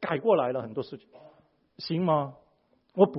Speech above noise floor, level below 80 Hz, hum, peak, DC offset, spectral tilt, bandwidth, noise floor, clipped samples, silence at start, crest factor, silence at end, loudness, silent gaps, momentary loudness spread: 40 dB; -72 dBFS; none; -6 dBFS; under 0.1%; -10.5 dB/octave; 5.8 kHz; -68 dBFS; under 0.1%; 0 s; 22 dB; 0 s; -28 LUFS; none; 16 LU